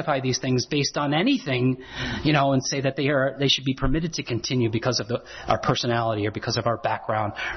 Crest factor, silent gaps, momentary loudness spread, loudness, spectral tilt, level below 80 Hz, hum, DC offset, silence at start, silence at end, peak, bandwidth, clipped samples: 16 dB; none; 6 LU; -24 LUFS; -5 dB/octave; -42 dBFS; none; under 0.1%; 0 s; 0 s; -8 dBFS; 6.4 kHz; under 0.1%